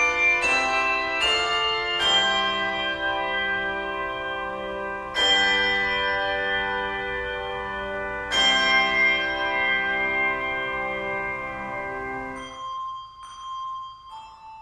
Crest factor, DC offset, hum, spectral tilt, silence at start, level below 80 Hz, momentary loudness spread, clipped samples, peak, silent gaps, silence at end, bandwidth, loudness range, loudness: 16 dB; under 0.1%; none; -1.5 dB/octave; 0 s; -50 dBFS; 15 LU; under 0.1%; -8 dBFS; none; 0 s; 12.5 kHz; 9 LU; -23 LUFS